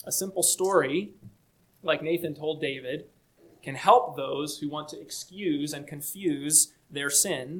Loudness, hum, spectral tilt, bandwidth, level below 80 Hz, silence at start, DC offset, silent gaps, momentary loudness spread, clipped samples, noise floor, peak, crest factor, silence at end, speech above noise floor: -26 LUFS; none; -2.5 dB/octave; 19 kHz; -70 dBFS; 0.05 s; under 0.1%; none; 16 LU; under 0.1%; -64 dBFS; -6 dBFS; 22 dB; 0 s; 37 dB